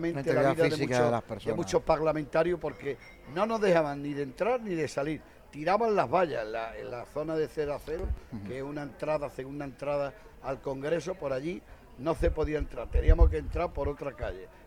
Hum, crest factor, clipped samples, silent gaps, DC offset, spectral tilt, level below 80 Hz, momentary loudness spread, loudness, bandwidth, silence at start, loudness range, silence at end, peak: none; 22 dB; under 0.1%; none; under 0.1%; -6.5 dB/octave; -36 dBFS; 12 LU; -31 LUFS; 14.5 kHz; 0 s; 6 LU; 0 s; -8 dBFS